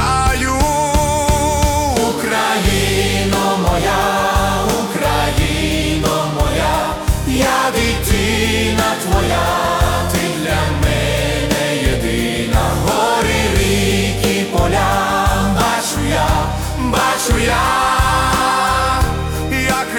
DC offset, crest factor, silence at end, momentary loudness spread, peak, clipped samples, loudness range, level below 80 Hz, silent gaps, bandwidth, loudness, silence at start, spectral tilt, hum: under 0.1%; 12 dB; 0 s; 3 LU; -2 dBFS; under 0.1%; 1 LU; -24 dBFS; none; 18 kHz; -15 LUFS; 0 s; -4 dB/octave; none